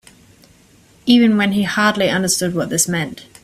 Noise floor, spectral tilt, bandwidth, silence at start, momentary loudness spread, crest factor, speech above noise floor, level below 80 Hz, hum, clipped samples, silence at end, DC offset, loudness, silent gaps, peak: -50 dBFS; -3.5 dB/octave; 16 kHz; 1.05 s; 9 LU; 18 dB; 34 dB; -52 dBFS; none; under 0.1%; 0.2 s; under 0.1%; -16 LUFS; none; 0 dBFS